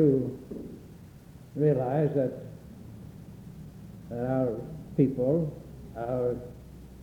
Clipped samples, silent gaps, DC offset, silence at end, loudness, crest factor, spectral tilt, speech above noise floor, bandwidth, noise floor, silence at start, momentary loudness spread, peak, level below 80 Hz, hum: under 0.1%; none; under 0.1%; 0 s; -29 LUFS; 20 dB; -10 dB/octave; 22 dB; 17.5 kHz; -49 dBFS; 0 s; 21 LU; -10 dBFS; -54 dBFS; none